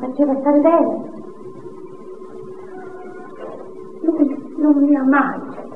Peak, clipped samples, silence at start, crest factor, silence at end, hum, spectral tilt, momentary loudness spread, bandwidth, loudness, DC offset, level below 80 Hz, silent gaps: -2 dBFS; under 0.1%; 0 s; 18 dB; 0 s; none; -8.5 dB/octave; 22 LU; 3.4 kHz; -17 LUFS; 1%; -68 dBFS; none